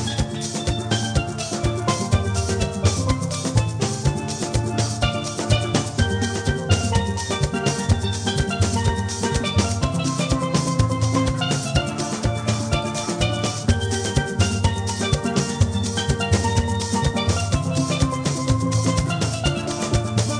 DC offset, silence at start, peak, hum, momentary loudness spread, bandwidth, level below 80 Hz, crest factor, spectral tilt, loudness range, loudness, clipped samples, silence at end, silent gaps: under 0.1%; 0 s; -4 dBFS; none; 3 LU; 10.5 kHz; -32 dBFS; 16 dB; -5 dB/octave; 1 LU; -22 LUFS; under 0.1%; 0 s; none